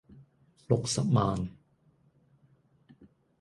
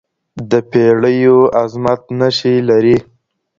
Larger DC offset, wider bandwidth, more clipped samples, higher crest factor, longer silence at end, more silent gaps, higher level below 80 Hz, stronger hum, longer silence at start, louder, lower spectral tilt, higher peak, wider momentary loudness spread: neither; first, 11.5 kHz vs 7.4 kHz; neither; first, 24 dB vs 12 dB; second, 0.35 s vs 0.55 s; neither; second, -56 dBFS vs -50 dBFS; neither; second, 0.15 s vs 0.35 s; second, -29 LUFS vs -12 LUFS; about the same, -6 dB/octave vs -7 dB/octave; second, -10 dBFS vs 0 dBFS; about the same, 9 LU vs 7 LU